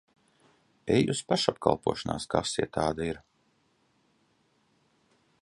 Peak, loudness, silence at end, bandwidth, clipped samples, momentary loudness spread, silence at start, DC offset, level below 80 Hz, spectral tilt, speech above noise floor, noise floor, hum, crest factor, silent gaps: -6 dBFS; -29 LUFS; 2.25 s; 11.5 kHz; under 0.1%; 9 LU; 0.85 s; under 0.1%; -56 dBFS; -5 dB/octave; 42 dB; -70 dBFS; none; 26 dB; none